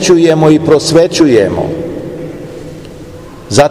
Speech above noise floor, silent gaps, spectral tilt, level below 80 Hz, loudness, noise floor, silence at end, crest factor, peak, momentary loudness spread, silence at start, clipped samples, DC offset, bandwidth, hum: 22 dB; none; -5.5 dB/octave; -40 dBFS; -9 LUFS; -29 dBFS; 0 s; 10 dB; 0 dBFS; 22 LU; 0 s; 3%; 0.7%; 14 kHz; none